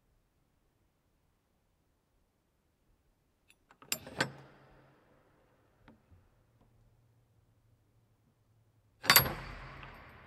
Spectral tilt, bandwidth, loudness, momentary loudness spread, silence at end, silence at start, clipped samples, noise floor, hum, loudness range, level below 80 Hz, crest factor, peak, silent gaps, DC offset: -1.5 dB/octave; 15.5 kHz; -29 LUFS; 25 LU; 0.35 s; 3.9 s; under 0.1%; -76 dBFS; none; 13 LU; -62 dBFS; 36 dB; -4 dBFS; none; under 0.1%